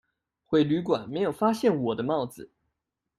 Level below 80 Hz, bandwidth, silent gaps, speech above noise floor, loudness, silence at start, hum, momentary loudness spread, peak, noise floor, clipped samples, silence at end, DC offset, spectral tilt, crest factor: -66 dBFS; 14 kHz; none; 57 dB; -26 LUFS; 0.5 s; none; 6 LU; -10 dBFS; -83 dBFS; under 0.1%; 0.75 s; under 0.1%; -7 dB/octave; 16 dB